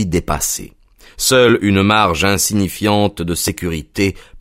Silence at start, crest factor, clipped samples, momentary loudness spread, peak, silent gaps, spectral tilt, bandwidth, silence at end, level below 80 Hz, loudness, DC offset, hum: 0 s; 16 dB; under 0.1%; 8 LU; 0 dBFS; none; -4 dB/octave; 16.5 kHz; 0 s; -36 dBFS; -15 LUFS; under 0.1%; none